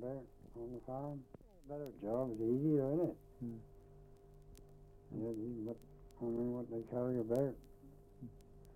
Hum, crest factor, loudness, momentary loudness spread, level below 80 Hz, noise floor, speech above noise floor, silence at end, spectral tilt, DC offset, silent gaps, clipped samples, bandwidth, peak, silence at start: none; 18 dB; -41 LUFS; 25 LU; -64 dBFS; -60 dBFS; 20 dB; 0 s; -10 dB/octave; under 0.1%; none; under 0.1%; 16 kHz; -24 dBFS; 0 s